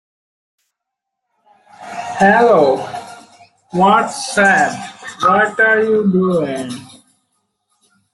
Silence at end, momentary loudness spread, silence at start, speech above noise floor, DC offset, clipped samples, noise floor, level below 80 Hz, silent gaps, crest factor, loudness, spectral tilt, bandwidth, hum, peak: 1.25 s; 17 LU; 1.8 s; 66 dB; under 0.1%; under 0.1%; -79 dBFS; -58 dBFS; none; 16 dB; -14 LUFS; -5 dB/octave; 12 kHz; none; -2 dBFS